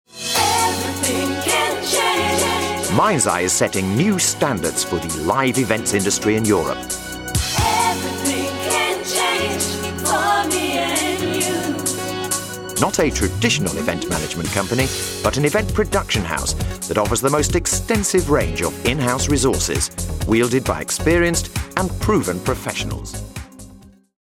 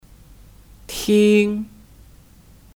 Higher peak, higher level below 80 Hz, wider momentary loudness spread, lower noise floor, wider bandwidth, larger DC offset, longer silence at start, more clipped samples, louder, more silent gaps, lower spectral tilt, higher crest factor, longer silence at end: first, 0 dBFS vs -4 dBFS; first, -34 dBFS vs -48 dBFS; second, 6 LU vs 18 LU; second, -44 dBFS vs -48 dBFS; about the same, 18 kHz vs 17.5 kHz; neither; second, 0.15 s vs 0.9 s; neither; about the same, -19 LUFS vs -18 LUFS; neither; second, -3.5 dB/octave vs -5.5 dB/octave; about the same, 20 dB vs 18 dB; second, 0.3 s vs 1.1 s